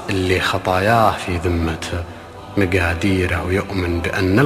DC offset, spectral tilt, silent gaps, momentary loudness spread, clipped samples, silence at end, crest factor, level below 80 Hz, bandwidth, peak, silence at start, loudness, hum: under 0.1%; -6 dB/octave; none; 10 LU; under 0.1%; 0 s; 18 dB; -30 dBFS; 14.5 kHz; -2 dBFS; 0 s; -19 LUFS; none